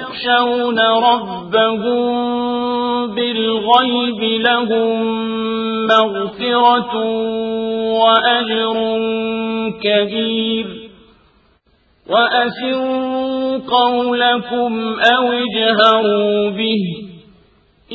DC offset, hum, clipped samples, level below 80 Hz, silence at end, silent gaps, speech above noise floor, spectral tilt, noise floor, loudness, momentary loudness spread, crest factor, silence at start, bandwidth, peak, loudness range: under 0.1%; none; under 0.1%; -56 dBFS; 0 s; none; 41 dB; -6 dB/octave; -56 dBFS; -15 LUFS; 7 LU; 16 dB; 0 s; 7.2 kHz; 0 dBFS; 5 LU